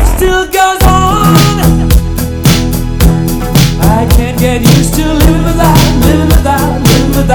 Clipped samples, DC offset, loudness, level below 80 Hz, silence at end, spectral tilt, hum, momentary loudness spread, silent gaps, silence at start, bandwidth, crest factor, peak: 6%; under 0.1%; -8 LUFS; -12 dBFS; 0 s; -5.5 dB/octave; none; 4 LU; none; 0 s; over 20 kHz; 6 dB; 0 dBFS